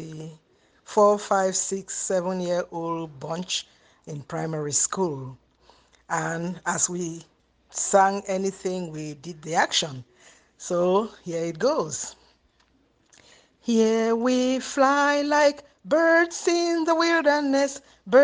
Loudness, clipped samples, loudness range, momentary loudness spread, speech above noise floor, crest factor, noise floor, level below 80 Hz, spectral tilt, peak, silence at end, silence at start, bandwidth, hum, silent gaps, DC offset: -24 LUFS; under 0.1%; 7 LU; 16 LU; 41 dB; 20 dB; -64 dBFS; -66 dBFS; -3.5 dB/octave; -4 dBFS; 0 s; 0 s; 10 kHz; none; none; under 0.1%